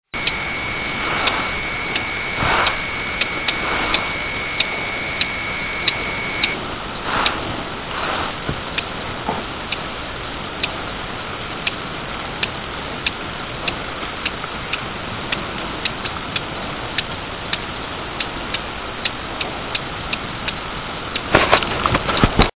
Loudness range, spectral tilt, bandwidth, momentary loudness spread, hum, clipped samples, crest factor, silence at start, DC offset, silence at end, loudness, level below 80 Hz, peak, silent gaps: 5 LU; -2 dB/octave; 4 kHz; 9 LU; none; under 0.1%; 22 dB; 0.15 s; under 0.1%; 0.1 s; -22 LUFS; -36 dBFS; 0 dBFS; none